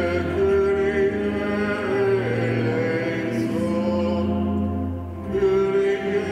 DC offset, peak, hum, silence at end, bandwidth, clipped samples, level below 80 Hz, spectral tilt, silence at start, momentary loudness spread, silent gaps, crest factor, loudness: under 0.1%; -10 dBFS; none; 0 s; 10.5 kHz; under 0.1%; -42 dBFS; -7.5 dB/octave; 0 s; 5 LU; none; 12 dB; -22 LUFS